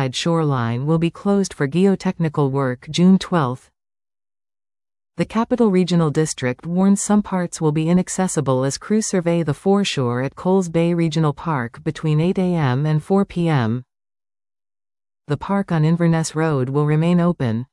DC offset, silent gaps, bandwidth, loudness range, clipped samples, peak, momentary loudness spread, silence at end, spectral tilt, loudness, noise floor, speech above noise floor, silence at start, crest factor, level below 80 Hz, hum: under 0.1%; none; 12 kHz; 3 LU; under 0.1%; -4 dBFS; 6 LU; 0.1 s; -6.5 dB/octave; -19 LUFS; under -90 dBFS; over 72 dB; 0 s; 14 dB; -52 dBFS; none